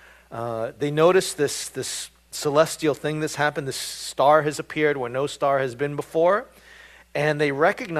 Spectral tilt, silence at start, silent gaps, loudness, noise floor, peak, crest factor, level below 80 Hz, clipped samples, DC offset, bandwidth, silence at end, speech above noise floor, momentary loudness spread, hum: -4 dB/octave; 0.3 s; none; -23 LUFS; -49 dBFS; -4 dBFS; 20 dB; -60 dBFS; under 0.1%; under 0.1%; 15 kHz; 0 s; 26 dB; 11 LU; none